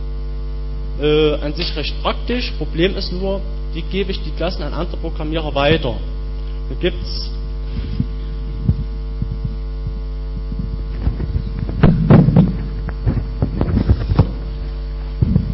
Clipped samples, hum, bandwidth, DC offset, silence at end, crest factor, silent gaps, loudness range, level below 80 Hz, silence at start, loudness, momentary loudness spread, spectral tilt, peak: under 0.1%; none; 5.8 kHz; under 0.1%; 0 s; 16 dB; none; 8 LU; -22 dBFS; 0 s; -20 LUFS; 12 LU; -10 dB/octave; -2 dBFS